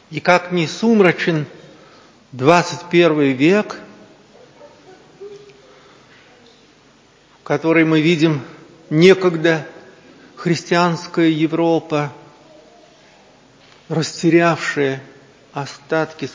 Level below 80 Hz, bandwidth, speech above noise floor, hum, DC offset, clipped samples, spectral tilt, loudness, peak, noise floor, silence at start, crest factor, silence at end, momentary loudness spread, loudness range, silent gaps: -66 dBFS; 8 kHz; 35 dB; none; under 0.1%; under 0.1%; -6 dB/octave; -16 LUFS; 0 dBFS; -51 dBFS; 0.1 s; 18 dB; 0.05 s; 16 LU; 5 LU; none